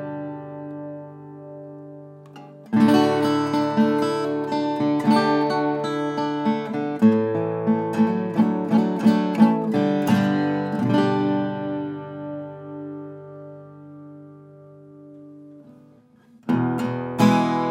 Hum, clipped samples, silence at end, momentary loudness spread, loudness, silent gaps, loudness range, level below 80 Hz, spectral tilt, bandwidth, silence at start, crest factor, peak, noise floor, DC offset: none; under 0.1%; 0 s; 22 LU; -21 LUFS; none; 15 LU; -72 dBFS; -7 dB/octave; 15.5 kHz; 0 s; 18 dB; -4 dBFS; -53 dBFS; under 0.1%